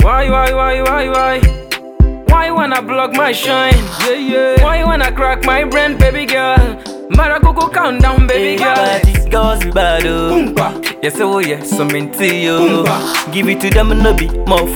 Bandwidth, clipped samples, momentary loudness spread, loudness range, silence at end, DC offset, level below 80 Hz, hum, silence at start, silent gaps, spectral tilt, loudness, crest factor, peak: 19.5 kHz; 0.2%; 5 LU; 2 LU; 0 s; under 0.1%; -16 dBFS; none; 0 s; none; -5 dB/octave; -12 LUFS; 12 dB; 0 dBFS